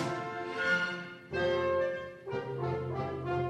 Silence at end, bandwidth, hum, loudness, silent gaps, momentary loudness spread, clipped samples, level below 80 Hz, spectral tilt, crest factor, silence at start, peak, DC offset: 0 s; 11.5 kHz; none; -34 LUFS; none; 9 LU; under 0.1%; -60 dBFS; -6 dB/octave; 14 dB; 0 s; -18 dBFS; under 0.1%